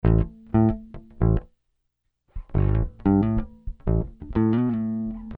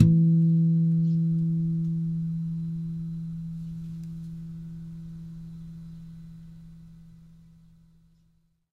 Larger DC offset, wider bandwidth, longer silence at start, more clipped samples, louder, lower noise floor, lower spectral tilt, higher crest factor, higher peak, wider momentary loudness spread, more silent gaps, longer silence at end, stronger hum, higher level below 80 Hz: neither; first, 3.7 kHz vs 0.5 kHz; about the same, 0.05 s vs 0 s; neither; about the same, -24 LUFS vs -26 LUFS; first, -76 dBFS vs -66 dBFS; about the same, -12.5 dB/octave vs -11.5 dB/octave; second, 16 dB vs 22 dB; second, -8 dBFS vs -4 dBFS; second, 10 LU vs 23 LU; neither; second, 0 s vs 1.45 s; neither; first, -30 dBFS vs -52 dBFS